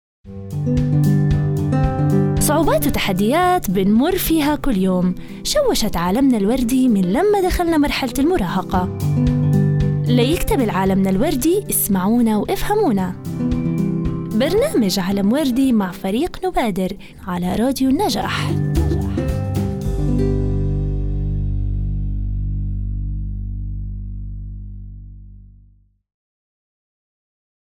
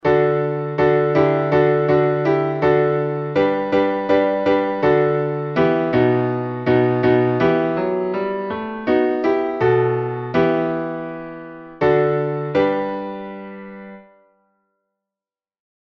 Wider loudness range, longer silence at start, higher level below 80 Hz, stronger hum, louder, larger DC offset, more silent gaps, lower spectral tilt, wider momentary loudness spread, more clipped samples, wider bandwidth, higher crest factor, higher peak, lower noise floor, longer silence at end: first, 10 LU vs 5 LU; first, 0.25 s vs 0.05 s; first, -28 dBFS vs -52 dBFS; first, 50 Hz at -40 dBFS vs none; about the same, -18 LUFS vs -18 LUFS; neither; neither; second, -6 dB/octave vs -9 dB/octave; about the same, 10 LU vs 12 LU; neither; first, 19.5 kHz vs 6.2 kHz; about the same, 14 dB vs 16 dB; about the same, -4 dBFS vs -4 dBFS; second, -52 dBFS vs under -90 dBFS; first, 2.3 s vs 1.9 s